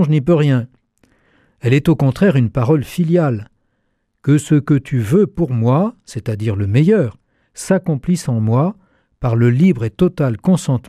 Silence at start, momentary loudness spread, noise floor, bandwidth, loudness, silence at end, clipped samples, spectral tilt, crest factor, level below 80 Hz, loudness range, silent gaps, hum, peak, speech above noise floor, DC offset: 0 s; 8 LU; -67 dBFS; 14 kHz; -16 LUFS; 0.1 s; under 0.1%; -8 dB/octave; 14 dB; -44 dBFS; 2 LU; none; none; -2 dBFS; 52 dB; under 0.1%